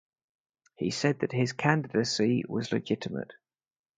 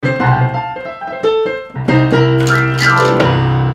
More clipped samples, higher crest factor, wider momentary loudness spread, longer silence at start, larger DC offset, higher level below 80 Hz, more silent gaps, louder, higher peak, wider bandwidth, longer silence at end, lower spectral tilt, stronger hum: neither; first, 24 dB vs 12 dB; about the same, 9 LU vs 10 LU; first, 0.8 s vs 0 s; neither; second, -68 dBFS vs -38 dBFS; neither; second, -29 LUFS vs -13 LUFS; second, -6 dBFS vs 0 dBFS; second, 9.4 kHz vs 12 kHz; first, 0.65 s vs 0 s; about the same, -5.5 dB/octave vs -6.5 dB/octave; neither